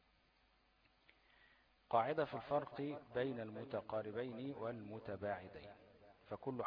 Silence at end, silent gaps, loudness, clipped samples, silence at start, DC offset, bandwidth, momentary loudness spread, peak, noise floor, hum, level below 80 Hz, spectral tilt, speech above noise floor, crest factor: 0 s; none; -44 LUFS; under 0.1%; 1.9 s; under 0.1%; 5.2 kHz; 13 LU; -22 dBFS; -75 dBFS; none; -76 dBFS; -5 dB/octave; 32 dB; 24 dB